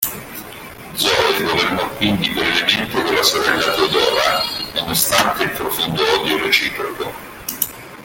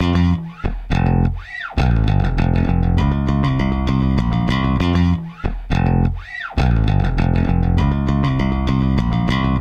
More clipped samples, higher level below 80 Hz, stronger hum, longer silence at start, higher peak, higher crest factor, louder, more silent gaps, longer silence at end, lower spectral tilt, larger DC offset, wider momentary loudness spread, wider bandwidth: neither; second, -46 dBFS vs -22 dBFS; neither; about the same, 0 s vs 0 s; first, 0 dBFS vs -6 dBFS; first, 18 dB vs 12 dB; about the same, -16 LUFS vs -18 LUFS; neither; about the same, 0 s vs 0 s; second, -2.5 dB/octave vs -8 dB/octave; neither; first, 13 LU vs 6 LU; first, 17 kHz vs 8 kHz